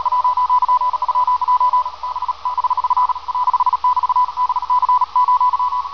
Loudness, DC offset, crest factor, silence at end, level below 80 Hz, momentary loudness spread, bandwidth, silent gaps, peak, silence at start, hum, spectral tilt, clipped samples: -17 LUFS; 0.9%; 10 dB; 0 s; -52 dBFS; 5 LU; 5.4 kHz; none; -6 dBFS; 0 s; none; -2 dB/octave; under 0.1%